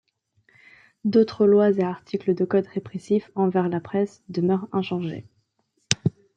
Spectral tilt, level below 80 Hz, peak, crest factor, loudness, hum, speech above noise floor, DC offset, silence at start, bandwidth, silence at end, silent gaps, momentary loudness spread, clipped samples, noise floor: -6 dB/octave; -64 dBFS; -2 dBFS; 22 dB; -23 LUFS; none; 49 dB; under 0.1%; 1.05 s; 9.6 kHz; 0.3 s; none; 11 LU; under 0.1%; -71 dBFS